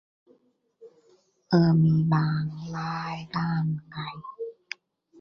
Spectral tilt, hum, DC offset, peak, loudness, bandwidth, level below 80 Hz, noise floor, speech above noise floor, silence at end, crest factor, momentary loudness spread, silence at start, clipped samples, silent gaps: -8.5 dB/octave; none; under 0.1%; -8 dBFS; -26 LUFS; 6.4 kHz; -60 dBFS; -66 dBFS; 41 dB; 0.7 s; 20 dB; 18 LU; 0.8 s; under 0.1%; none